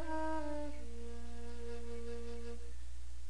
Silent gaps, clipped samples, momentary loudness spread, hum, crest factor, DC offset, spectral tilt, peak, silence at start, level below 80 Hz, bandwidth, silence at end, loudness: none; under 0.1%; 11 LU; none; 14 dB; 2%; -6 dB/octave; -26 dBFS; 0 s; -50 dBFS; 10.5 kHz; 0 s; -46 LUFS